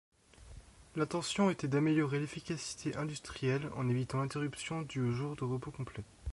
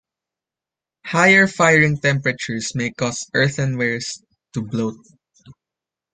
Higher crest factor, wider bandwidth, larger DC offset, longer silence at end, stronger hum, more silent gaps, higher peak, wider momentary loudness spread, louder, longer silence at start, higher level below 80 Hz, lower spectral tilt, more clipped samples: about the same, 16 dB vs 20 dB; first, 11.5 kHz vs 9.6 kHz; neither; second, 0 s vs 0.6 s; neither; neither; second, -20 dBFS vs -2 dBFS; second, 13 LU vs 17 LU; second, -36 LUFS vs -18 LUFS; second, 0.4 s vs 1.05 s; about the same, -58 dBFS vs -56 dBFS; first, -6 dB/octave vs -4.5 dB/octave; neither